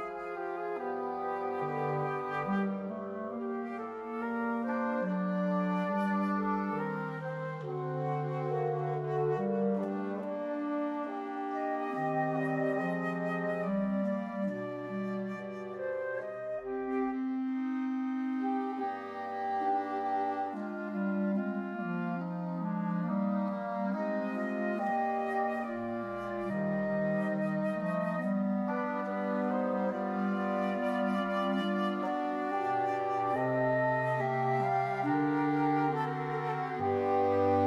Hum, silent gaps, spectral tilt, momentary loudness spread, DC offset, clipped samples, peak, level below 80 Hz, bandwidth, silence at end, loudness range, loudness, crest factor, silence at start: none; none; -8.5 dB/octave; 7 LU; under 0.1%; under 0.1%; -18 dBFS; -72 dBFS; 11.5 kHz; 0 s; 4 LU; -33 LUFS; 14 dB; 0 s